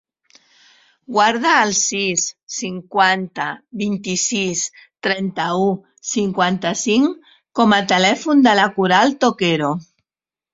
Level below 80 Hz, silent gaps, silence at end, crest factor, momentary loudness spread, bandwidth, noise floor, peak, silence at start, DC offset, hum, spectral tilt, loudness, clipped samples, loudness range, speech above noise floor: -60 dBFS; 2.43-2.47 s; 0.7 s; 18 dB; 12 LU; 8 kHz; under -90 dBFS; 0 dBFS; 1.1 s; under 0.1%; none; -3 dB/octave; -17 LUFS; under 0.1%; 5 LU; over 73 dB